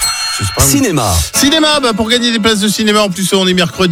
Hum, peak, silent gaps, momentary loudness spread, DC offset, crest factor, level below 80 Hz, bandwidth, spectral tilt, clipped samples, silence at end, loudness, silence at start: none; 0 dBFS; none; 3 LU; under 0.1%; 12 dB; -30 dBFS; 18 kHz; -3 dB/octave; under 0.1%; 0 s; -10 LUFS; 0 s